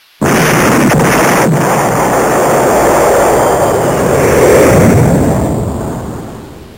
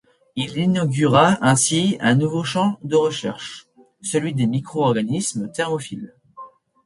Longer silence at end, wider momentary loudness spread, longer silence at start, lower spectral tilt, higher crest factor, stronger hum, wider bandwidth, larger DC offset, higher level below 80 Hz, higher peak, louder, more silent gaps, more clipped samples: second, 0.05 s vs 0.4 s; second, 12 LU vs 18 LU; second, 0.2 s vs 0.35 s; about the same, -5.5 dB/octave vs -5 dB/octave; second, 10 dB vs 18 dB; neither; first, 17.5 kHz vs 11.5 kHz; first, 0.4% vs under 0.1%; first, -28 dBFS vs -58 dBFS; about the same, 0 dBFS vs -2 dBFS; first, -9 LUFS vs -20 LUFS; neither; first, 0.4% vs under 0.1%